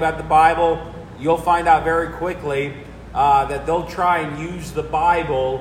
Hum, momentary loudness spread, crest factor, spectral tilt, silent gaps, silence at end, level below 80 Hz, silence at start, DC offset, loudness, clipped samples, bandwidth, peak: none; 12 LU; 16 dB; -5.5 dB/octave; none; 0 s; -38 dBFS; 0 s; under 0.1%; -19 LUFS; under 0.1%; 15.5 kHz; -2 dBFS